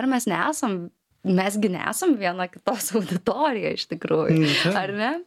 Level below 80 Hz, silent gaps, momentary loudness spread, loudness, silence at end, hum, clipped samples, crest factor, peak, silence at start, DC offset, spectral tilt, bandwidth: -66 dBFS; none; 8 LU; -23 LUFS; 0 s; none; under 0.1%; 18 dB; -6 dBFS; 0 s; under 0.1%; -4.5 dB/octave; 16.5 kHz